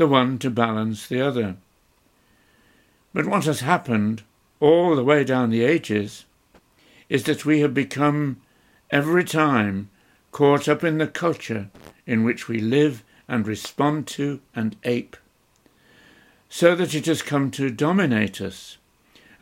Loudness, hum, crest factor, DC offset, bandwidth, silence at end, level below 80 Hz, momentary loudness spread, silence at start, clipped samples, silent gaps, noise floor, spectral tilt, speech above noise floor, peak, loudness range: -22 LUFS; none; 20 dB; under 0.1%; 16.5 kHz; 0.7 s; -64 dBFS; 14 LU; 0 s; under 0.1%; none; -62 dBFS; -6 dB/octave; 41 dB; -2 dBFS; 5 LU